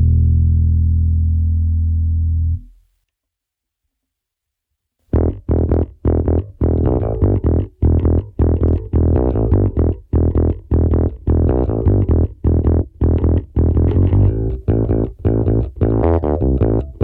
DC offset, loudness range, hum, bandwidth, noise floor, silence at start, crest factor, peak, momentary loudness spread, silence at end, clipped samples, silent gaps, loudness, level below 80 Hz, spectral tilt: under 0.1%; 7 LU; none; 2.5 kHz; -81 dBFS; 0 s; 16 dB; 0 dBFS; 4 LU; 0 s; under 0.1%; none; -17 LUFS; -20 dBFS; -13.5 dB/octave